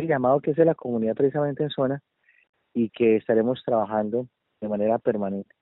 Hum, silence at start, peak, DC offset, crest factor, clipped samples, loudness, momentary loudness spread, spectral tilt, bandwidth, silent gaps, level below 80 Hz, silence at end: none; 0 s; -6 dBFS; under 0.1%; 18 dB; under 0.1%; -24 LUFS; 10 LU; -6.5 dB/octave; 4.1 kHz; 2.49-2.53 s; -68 dBFS; 0.2 s